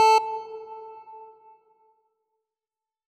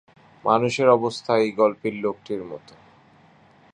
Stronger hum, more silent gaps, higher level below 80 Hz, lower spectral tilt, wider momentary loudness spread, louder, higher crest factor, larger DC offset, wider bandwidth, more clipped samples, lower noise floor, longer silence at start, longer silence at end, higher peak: neither; neither; second, -88 dBFS vs -66 dBFS; second, 1 dB/octave vs -5.5 dB/octave; first, 25 LU vs 13 LU; second, -25 LUFS vs -22 LUFS; about the same, 16 dB vs 20 dB; neither; first, 14 kHz vs 10 kHz; neither; first, under -90 dBFS vs -54 dBFS; second, 0 s vs 0.45 s; first, 1.85 s vs 1.15 s; second, -12 dBFS vs -4 dBFS